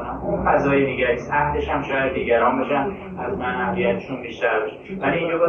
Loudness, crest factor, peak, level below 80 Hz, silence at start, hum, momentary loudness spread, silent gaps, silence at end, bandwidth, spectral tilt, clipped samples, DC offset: -22 LUFS; 16 dB; -6 dBFS; -42 dBFS; 0 s; none; 8 LU; none; 0 s; 6.8 kHz; -7.5 dB/octave; under 0.1%; under 0.1%